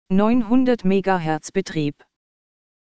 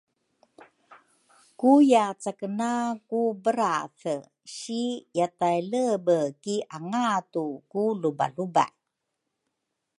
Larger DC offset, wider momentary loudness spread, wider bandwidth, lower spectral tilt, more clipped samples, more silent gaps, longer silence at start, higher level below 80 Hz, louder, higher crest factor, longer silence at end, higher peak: neither; second, 8 LU vs 12 LU; second, 9.2 kHz vs 11.5 kHz; first, -7 dB/octave vs -5.5 dB/octave; neither; neither; second, 0.05 s vs 0.9 s; first, -46 dBFS vs -80 dBFS; first, -20 LUFS vs -26 LUFS; about the same, 16 dB vs 20 dB; second, 0.65 s vs 1.3 s; about the same, -4 dBFS vs -6 dBFS